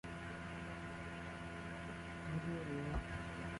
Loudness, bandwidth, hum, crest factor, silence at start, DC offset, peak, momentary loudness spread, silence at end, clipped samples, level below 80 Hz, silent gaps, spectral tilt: -46 LUFS; 11.5 kHz; none; 16 dB; 0.05 s; under 0.1%; -30 dBFS; 5 LU; 0 s; under 0.1%; -54 dBFS; none; -6.5 dB/octave